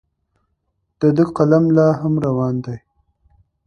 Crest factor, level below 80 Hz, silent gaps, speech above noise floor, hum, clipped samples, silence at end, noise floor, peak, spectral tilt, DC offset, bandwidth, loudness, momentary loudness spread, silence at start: 18 dB; -52 dBFS; none; 55 dB; none; under 0.1%; 0.9 s; -70 dBFS; 0 dBFS; -10 dB/octave; under 0.1%; 6.8 kHz; -16 LUFS; 12 LU; 1 s